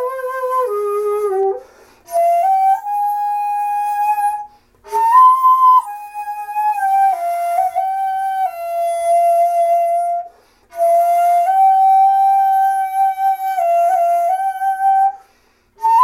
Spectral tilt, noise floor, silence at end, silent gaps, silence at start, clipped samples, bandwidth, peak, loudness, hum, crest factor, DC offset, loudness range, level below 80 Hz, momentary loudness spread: -2 dB/octave; -56 dBFS; 0 s; none; 0 s; under 0.1%; 16 kHz; -2 dBFS; -15 LUFS; none; 14 dB; under 0.1%; 4 LU; -64 dBFS; 10 LU